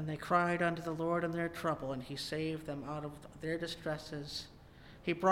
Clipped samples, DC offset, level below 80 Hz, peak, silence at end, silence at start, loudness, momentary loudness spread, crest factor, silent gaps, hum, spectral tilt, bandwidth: under 0.1%; under 0.1%; -62 dBFS; -14 dBFS; 0 s; 0 s; -37 LUFS; 11 LU; 22 dB; none; none; -5.5 dB/octave; 16.5 kHz